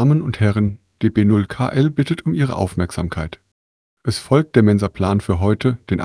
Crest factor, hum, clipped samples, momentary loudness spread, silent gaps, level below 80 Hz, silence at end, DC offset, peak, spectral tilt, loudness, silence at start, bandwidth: 18 dB; none; under 0.1%; 9 LU; 3.52-3.97 s; -40 dBFS; 0 s; under 0.1%; 0 dBFS; -7.5 dB/octave; -18 LUFS; 0 s; 11 kHz